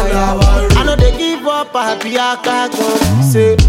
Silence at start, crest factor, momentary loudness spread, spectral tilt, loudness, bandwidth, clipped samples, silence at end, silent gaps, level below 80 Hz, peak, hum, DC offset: 0 s; 10 dB; 6 LU; -5.5 dB/octave; -13 LUFS; 16.5 kHz; under 0.1%; 0 s; none; -16 dBFS; 0 dBFS; none; under 0.1%